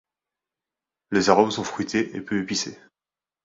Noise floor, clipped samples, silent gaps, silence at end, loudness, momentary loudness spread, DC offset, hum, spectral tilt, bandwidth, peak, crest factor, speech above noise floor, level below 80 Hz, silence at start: under -90 dBFS; under 0.1%; none; 0.7 s; -23 LUFS; 9 LU; under 0.1%; none; -4 dB/octave; 7.8 kHz; -2 dBFS; 24 dB; over 67 dB; -60 dBFS; 1.1 s